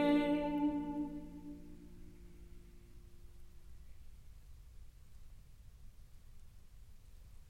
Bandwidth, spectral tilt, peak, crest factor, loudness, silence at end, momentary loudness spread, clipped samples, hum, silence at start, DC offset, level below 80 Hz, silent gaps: 12.5 kHz; -7 dB/octave; -22 dBFS; 20 dB; -38 LUFS; 0 s; 27 LU; under 0.1%; none; 0 s; under 0.1%; -56 dBFS; none